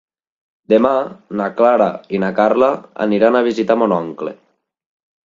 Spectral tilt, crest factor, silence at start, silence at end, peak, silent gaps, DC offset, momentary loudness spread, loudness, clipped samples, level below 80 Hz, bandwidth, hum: -7.5 dB/octave; 16 dB; 0.7 s; 0.9 s; 0 dBFS; none; under 0.1%; 10 LU; -16 LUFS; under 0.1%; -60 dBFS; 7.4 kHz; none